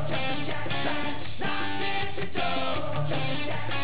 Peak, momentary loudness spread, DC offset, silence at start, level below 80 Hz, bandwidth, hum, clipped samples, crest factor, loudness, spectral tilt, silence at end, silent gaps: -14 dBFS; 3 LU; 5%; 0 s; -50 dBFS; 4 kHz; none; under 0.1%; 16 dB; -30 LUFS; -9 dB/octave; 0 s; none